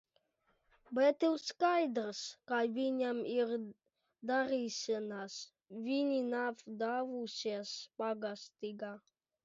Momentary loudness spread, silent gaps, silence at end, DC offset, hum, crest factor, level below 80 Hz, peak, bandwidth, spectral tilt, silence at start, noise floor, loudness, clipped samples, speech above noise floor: 14 LU; none; 0.45 s; under 0.1%; none; 18 dB; -86 dBFS; -18 dBFS; 7.6 kHz; -2.5 dB/octave; 0.9 s; -79 dBFS; -37 LUFS; under 0.1%; 42 dB